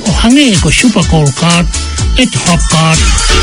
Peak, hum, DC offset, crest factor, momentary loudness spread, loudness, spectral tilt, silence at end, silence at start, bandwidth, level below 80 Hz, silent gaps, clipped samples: 0 dBFS; none; under 0.1%; 8 dB; 4 LU; -8 LUFS; -4 dB/octave; 0 s; 0 s; 14.5 kHz; -16 dBFS; none; 1%